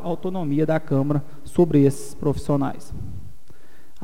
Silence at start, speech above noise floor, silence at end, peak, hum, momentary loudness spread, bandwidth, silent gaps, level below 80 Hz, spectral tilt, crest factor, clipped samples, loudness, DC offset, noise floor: 0 s; 32 dB; 0.75 s; -6 dBFS; none; 18 LU; 15.5 kHz; none; -44 dBFS; -8 dB/octave; 16 dB; under 0.1%; -22 LUFS; 4%; -53 dBFS